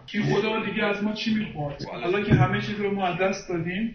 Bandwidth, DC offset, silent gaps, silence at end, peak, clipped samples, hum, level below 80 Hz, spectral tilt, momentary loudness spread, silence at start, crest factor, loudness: 6.8 kHz; under 0.1%; none; 0 s; -6 dBFS; under 0.1%; none; -48 dBFS; -6.5 dB/octave; 9 LU; 0 s; 20 dB; -25 LUFS